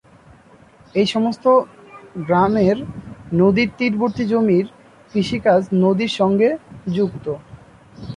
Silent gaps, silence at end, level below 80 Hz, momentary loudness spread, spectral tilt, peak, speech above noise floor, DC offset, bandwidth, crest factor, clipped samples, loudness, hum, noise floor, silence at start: none; 0 s; -50 dBFS; 15 LU; -7 dB/octave; -4 dBFS; 31 dB; under 0.1%; 10.5 kHz; 16 dB; under 0.1%; -18 LUFS; none; -48 dBFS; 0.95 s